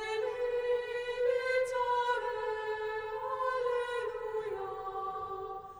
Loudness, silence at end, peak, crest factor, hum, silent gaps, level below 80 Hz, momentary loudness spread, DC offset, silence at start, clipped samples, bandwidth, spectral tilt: -34 LUFS; 0 s; -20 dBFS; 14 dB; none; none; -62 dBFS; 7 LU; under 0.1%; 0 s; under 0.1%; over 20 kHz; -3 dB/octave